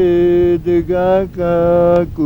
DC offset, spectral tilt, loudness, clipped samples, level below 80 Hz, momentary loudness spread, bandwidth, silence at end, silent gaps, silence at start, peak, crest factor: under 0.1%; -9.5 dB/octave; -13 LUFS; under 0.1%; -34 dBFS; 4 LU; 5.6 kHz; 0 s; none; 0 s; 0 dBFS; 12 dB